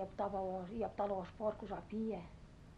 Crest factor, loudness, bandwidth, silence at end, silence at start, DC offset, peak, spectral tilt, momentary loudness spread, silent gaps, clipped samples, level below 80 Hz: 16 dB; -42 LUFS; 9.8 kHz; 0 s; 0 s; under 0.1%; -26 dBFS; -8 dB/octave; 8 LU; none; under 0.1%; -60 dBFS